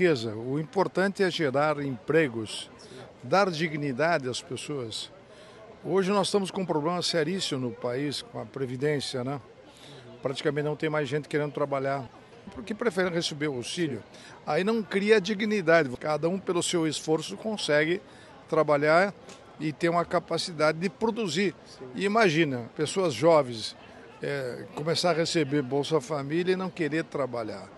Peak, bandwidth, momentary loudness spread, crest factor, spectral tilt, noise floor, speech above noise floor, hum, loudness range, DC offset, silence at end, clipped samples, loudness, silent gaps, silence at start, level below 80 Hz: -8 dBFS; 12.5 kHz; 13 LU; 20 dB; -5 dB/octave; -49 dBFS; 22 dB; none; 5 LU; under 0.1%; 0 s; under 0.1%; -28 LUFS; none; 0 s; -68 dBFS